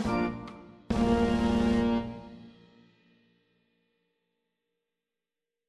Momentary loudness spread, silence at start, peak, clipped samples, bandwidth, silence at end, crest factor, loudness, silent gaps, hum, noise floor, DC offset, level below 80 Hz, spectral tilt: 20 LU; 0 s; -14 dBFS; under 0.1%; 10.5 kHz; 3.2 s; 18 dB; -28 LUFS; none; none; -90 dBFS; under 0.1%; -46 dBFS; -7 dB/octave